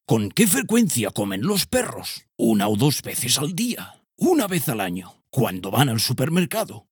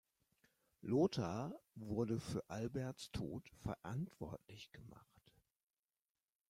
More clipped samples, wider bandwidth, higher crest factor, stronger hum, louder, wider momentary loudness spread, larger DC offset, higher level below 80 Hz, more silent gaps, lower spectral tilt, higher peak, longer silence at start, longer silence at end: neither; first, over 20 kHz vs 16 kHz; about the same, 18 dB vs 22 dB; neither; first, -21 LUFS vs -44 LUFS; second, 10 LU vs 18 LU; neither; first, -58 dBFS vs -68 dBFS; neither; second, -4.5 dB/octave vs -7 dB/octave; first, -4 dBFS vs -24 dBFS; second, 0.1 s vs 0.85 s; second, 0.1 s vs 1.5 s